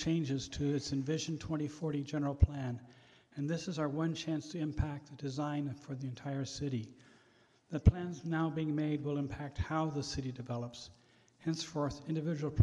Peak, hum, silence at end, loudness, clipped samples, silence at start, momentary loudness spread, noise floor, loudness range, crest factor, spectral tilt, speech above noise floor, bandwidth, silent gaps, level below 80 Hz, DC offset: -14 dBFS; none; 0 s; -37 LUFS; under 0.1%; 0 s; 10 LU; -68 dBFS; 4 LU; 22 dB; -6.5 dB/octave; 32 dB; 10.5 kHz; none; -46 dBFS; under 0.1%